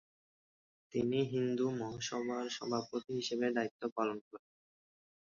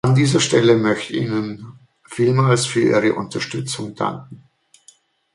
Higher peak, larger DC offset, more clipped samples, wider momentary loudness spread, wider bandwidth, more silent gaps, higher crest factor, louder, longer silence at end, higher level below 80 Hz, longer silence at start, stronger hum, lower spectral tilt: second, -20 dBFS vs -2 dBFS; neither; neither; second, 7 LU vs 12 LU; second, 7.2 kHz vs 11.5 kHz; first, 3.71-3.79 s, 3.92-3.96 s, 4.21-4.31 s vs none; about the same, 18 dB vs 16 dB; second, -37 LUFS vs -18 LUFS; about the same, 1 s vs 1 s; second, -76 dBFS vs -56 dBFS; first, 0.9 s vs 0.05 s; neither; about the same, -4.5 dB/octave vs -5.5 dB/octave